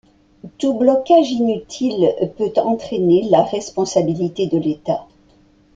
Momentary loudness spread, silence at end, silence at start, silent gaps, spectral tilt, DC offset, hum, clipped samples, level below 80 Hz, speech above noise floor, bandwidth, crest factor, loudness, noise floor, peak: 8 LU; 0.7 s; 0.45 s; none; -6.5 dB/octave; under 0.1%; none; under 0.1%; -54 dBFS; 35 dB; 7.8 kHz; 16 dB; -18 LUFS; -52 dBFS; -2 dBFS